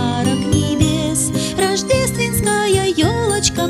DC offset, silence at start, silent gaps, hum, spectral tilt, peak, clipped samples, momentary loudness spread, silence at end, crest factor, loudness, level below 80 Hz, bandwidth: under 0.1%; 0 s; none; none; -4.5 dB/octave; -2 dBFS; under 0.1%; 2 LU; 0 s; 16 dB; -16 LUFS; -34 dBFS; 15.5 kHz